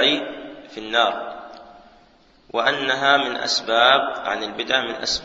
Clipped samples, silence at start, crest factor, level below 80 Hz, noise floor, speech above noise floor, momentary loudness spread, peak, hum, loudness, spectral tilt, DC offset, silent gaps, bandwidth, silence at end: under 0.1%; 0 s; 22 dB; -56 dBFS; -54 dBFS; 34 dB; 19 LU; 0 dBFS; none; -20 LUFS; -1.5 dB/octave; under 0.1%; none; 8 kHz; 0 s